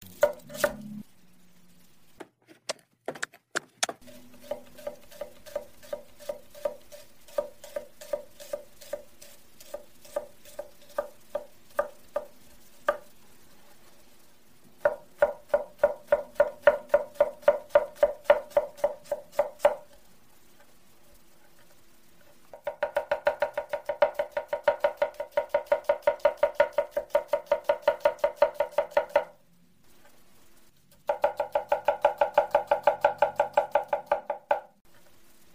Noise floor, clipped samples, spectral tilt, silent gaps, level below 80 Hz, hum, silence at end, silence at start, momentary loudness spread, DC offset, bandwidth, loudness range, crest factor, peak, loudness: -63 dBFS; under 0.1%; -2.5 dB/octave; none; -64 dBFS; none; 0.9 s; 0 s; 17 LU; 0.2%; 16 kHz; 13 LU; 26 dB; -4 dBFS; -29 LUFS